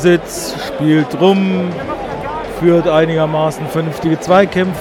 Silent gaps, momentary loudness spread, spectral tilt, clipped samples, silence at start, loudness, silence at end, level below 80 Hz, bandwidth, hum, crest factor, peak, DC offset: none; 11 LU; -6 dB/octave; under 0.1%; 0 s; -14 LUFS; 0 s; -40 dBFS; 17 kHz; none; 14 dB; 0 dBFS; under 0.1%